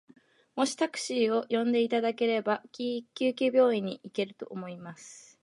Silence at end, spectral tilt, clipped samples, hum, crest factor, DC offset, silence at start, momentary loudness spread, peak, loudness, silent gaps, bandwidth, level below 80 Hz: 0.25 s; -4.5 dB/octave; under 0.1%; none; 16 dB; under 0.1%; 0.55 s; 16 LU; -12 dBFS; -29 LUFS; none; 11.5 kHz; -82 dBFS